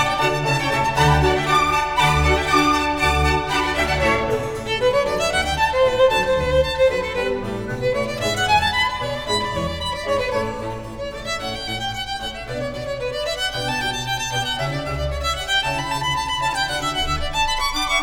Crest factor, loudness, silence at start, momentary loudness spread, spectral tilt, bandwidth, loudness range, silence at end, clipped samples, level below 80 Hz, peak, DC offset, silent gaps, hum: 16 dB; -20 LUFS; 0 s; 9 LU; -4 dB/octave; over 20 kHz; 7 LU; 0 s; under 0.1%; -32 dBFS; -4 dBFS; 0.3%; none; none